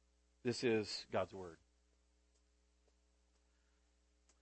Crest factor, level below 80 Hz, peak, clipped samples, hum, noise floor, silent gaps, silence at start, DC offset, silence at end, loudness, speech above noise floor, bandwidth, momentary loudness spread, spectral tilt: 22 dB; -76 dBFS; -26 dBFS; under 0.1%; none; -76 dBFS; none; 0.45 s; under 0.1%; 2.85 s; -41 LUFS; 36 dB; 8.4 kHz; 14 LU; -4.5 dB/octave